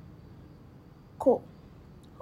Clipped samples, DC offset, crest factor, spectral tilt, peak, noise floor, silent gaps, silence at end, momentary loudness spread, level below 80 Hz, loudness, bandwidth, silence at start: under 0.1%; under 0.1%; 22 dB; -8.5 dB/octave; -12 dBFS; -52 dBFS; none; 0.8 s; 26 LU; -60 dBFS; -28 LUFS; 13 kHz; 1.2 s